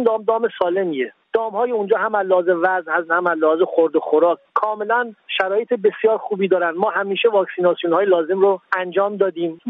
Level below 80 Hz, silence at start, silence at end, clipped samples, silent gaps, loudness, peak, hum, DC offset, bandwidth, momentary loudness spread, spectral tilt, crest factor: -74 dBFS; 0 s; 0 s; under 0.1%; none; -19 LUFS; -2 dBFS; none; under 0.1%; 4.7 kHz; 4 LU; -8 dB/octave; 16 dB